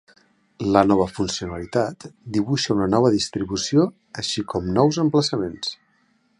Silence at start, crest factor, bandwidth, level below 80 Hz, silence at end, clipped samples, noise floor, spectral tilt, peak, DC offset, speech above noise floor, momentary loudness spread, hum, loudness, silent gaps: 0.6 s; 20 dB; 11 kHz; -48 dBFS; 0.65 s; under 0.1%; -63 dBFS; -5.5 dB/octave; -2 dBFS; under 0.1%; 42 dB; 10 LU; none; -22 LUFS; none